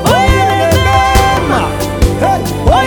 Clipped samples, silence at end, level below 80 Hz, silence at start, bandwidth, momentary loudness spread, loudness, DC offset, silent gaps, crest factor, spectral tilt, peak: under 0.1%; 0 s; -18 dBFS; 0 s; over 20 kHz; 5 LU; -11 LUFS; under 0.1%; none; 10 dB; -5 dB/octave; 0 dBFS